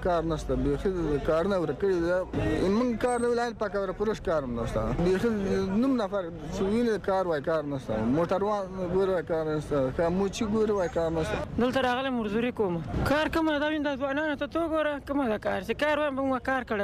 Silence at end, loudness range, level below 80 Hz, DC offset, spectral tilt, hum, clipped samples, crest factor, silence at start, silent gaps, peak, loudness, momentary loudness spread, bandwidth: 0 s; 1 LU; -44 dBFS; under 0.1%; -6.5 dB/octave; none; under 0.1%; 12 dB; 0 s; none; -16 dBFS; -28 LUFS; 4 LU; 15 kHz